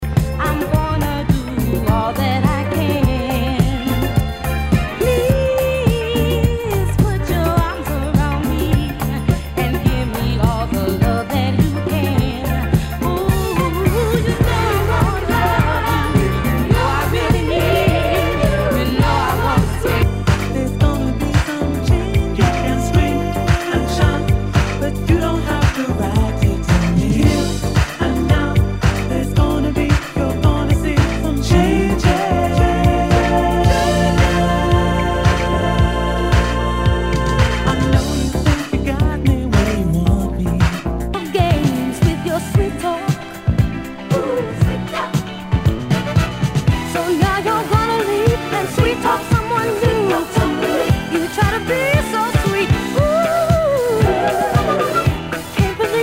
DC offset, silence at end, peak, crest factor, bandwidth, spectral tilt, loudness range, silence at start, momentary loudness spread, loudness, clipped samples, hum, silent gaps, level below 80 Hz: under 0.1%; 0 s; 0 dBFS; 16 dB; 16.5 kHz; -6.5 dB/octave; 3 LU; 0 s; 4 LU; -17 LUFS; under 0.1%; none; none; -24 dBFS